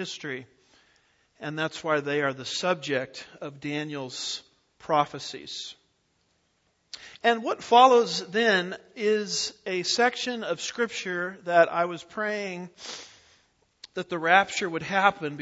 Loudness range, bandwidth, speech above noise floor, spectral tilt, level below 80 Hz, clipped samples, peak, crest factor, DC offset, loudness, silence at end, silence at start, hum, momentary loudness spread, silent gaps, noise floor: 9 LU; 8 kHz; 44 dB; -3 dB/octave; -72 dBFS; under 0.1%; -4 dBFS; 24 dB; under 0.1%; -26 LUFS; 0 s; 0 s; none; 17 LU; none; -71 dBFS